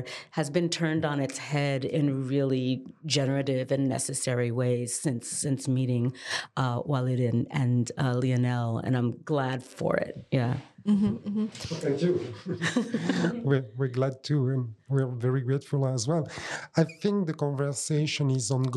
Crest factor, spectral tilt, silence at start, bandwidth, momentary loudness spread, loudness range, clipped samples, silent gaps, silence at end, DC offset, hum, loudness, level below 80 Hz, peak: 18 dB; -5.5 dB/octave; 0 s; 12.5 kHz; 5 LU; 1 LU; under 0.1%; none; 0 s; under 0.1%; none; -28 LUFS; -66 dBFS; -10 dBFS